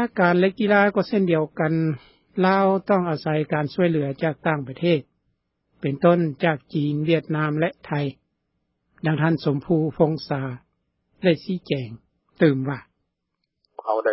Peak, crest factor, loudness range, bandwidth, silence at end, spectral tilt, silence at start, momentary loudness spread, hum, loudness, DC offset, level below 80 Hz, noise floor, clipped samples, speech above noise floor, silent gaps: -4 dBFS; 20 dB; 4 LU; 5.8 kHz; 0 s; -11.5 dB/octave; 0 s; 10 LU; none; -22 LUFS; under 0.1%; -62 dBFS; -78 dBFS; under 0.1%; 57 dB; none